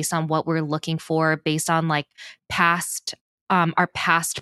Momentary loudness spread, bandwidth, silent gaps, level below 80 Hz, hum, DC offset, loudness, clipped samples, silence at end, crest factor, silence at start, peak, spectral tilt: 10 LU; 12.5 kHz; 3.21-3.47 s; -60 dBFS; none; under 0.1%; -22 LUFS; under 0.1%; 0 s; 20 dB; 0 s; -2 dBFS; -4 dB/octave